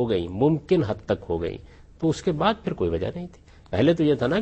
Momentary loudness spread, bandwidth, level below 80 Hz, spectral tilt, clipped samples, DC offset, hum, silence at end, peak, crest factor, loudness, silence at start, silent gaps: 11 LU; 8.4 kHz; -46 dBFS; -7.5 dB/octave; under 0.1%; under 0.1%; none; 0 s; -8 dBFS; 16 dB; -24 LUFS; 0 s; none